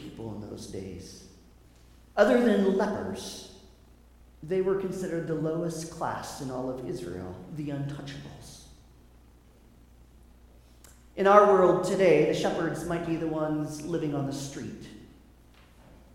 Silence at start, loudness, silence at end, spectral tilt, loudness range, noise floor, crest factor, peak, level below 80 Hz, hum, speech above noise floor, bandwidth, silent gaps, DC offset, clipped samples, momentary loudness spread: 0 s; -27 LUFS; 1.1 s; -6 dB/octave; 15 LU; -56 dBFS; 26 dB; -4 dBFS; -56 dBFS; none; 29 dB; 16 kHz; none; under 0.1%; under 0.1%; 21 LU